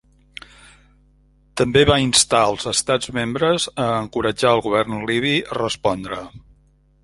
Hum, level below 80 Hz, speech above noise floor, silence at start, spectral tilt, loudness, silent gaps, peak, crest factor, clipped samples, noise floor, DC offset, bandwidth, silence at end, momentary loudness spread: none; -44 dBFS; 37 dB; 1.55 s; -3.5 dB/octave; -18 LUFS; none; -2 dBFS; 20 dB; under 0.1%; -56 dBFS; under 0.1%; 11.5 kHz; 0.65 s; 17 LU